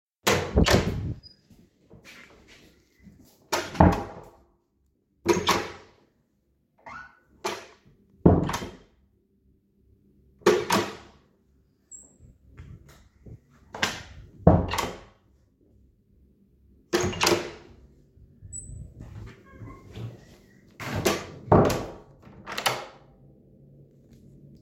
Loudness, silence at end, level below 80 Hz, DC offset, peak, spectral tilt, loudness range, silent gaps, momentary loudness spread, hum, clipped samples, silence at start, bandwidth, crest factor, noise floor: -25 LUFS; 1.7 s; -42 dBFS; under 0.1%; 0 dBFS; -5 dB/octave; 7 LU; none; 25 LU; none; under 0.1%; 0.25 s; 16.5 kHz; 28 dB; -70 dBFS